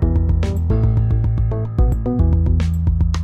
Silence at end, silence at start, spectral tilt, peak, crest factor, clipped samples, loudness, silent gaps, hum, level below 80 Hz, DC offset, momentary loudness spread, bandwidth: 0 s; 0 s; -9 dB/octave; -6 dBFS; 10 dB; under 0.1%; -18 LUFS; none; none; -20 dBFS; under 0.1%; 2 LU; 7.6 kHz